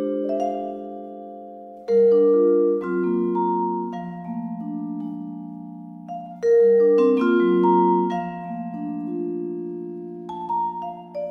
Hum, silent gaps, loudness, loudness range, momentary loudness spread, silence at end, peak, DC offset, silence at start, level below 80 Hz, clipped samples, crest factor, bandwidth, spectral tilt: none; none; -22 LUFS; 8 LU; 19 LU; 0 s; -8 dBFS; under 0.1%; 0 s; -68 dBFS; under 0.1%; 14 dB; 6.2 kHz; -9 dB/octave